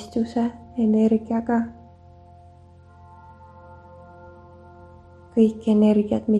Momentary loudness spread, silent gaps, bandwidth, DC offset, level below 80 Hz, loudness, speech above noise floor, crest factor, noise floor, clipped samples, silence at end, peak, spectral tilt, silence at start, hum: 9 LU; none; 8 kHz; under 0.1%; -54 dBFS; -21 LUFS; 29 dB; 18 dB; -49 dBFS; under 0.1%; 0 s; -6 dBFS; -8.5 dB/octave; 0 s; none